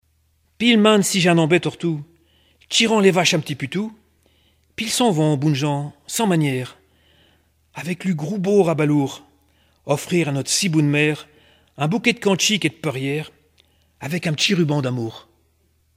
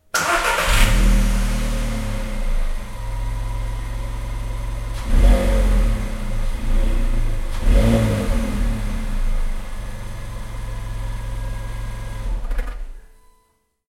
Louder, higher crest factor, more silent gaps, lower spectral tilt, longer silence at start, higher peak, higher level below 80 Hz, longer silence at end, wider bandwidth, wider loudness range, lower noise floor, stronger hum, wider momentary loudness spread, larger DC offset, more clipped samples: first, -19 LUFS vs -23 LUFS; about the same, 20 dB vs 16 dB; neither; about the same, -4.5 dB/octave vs -5 dB/octave; first, 0.6 s vs 0.15 s; about the same, 0 dBFS vs -2 dBFS; second, -62 dBFS vs -20 dBFS; about the same, 0.75 s vs 0.8 s; about the same, 16 kHz vs 15.5 kHz; second, 5 LU vs 10 LU; about the same, -63 dBFS vs -64 dBFS; neither; about the same, 14 LU vs 14 LU; neither; neither